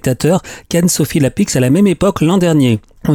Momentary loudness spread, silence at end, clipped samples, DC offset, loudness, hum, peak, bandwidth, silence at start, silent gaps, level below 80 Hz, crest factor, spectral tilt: 5 LU; 0 s; under 0.1%; under 0.1%; -13 LUFS; none; -2 dBFS; 18 kHz; 0.05 s; none; -38 dBFS; 10 dB; -5.5 dB/octave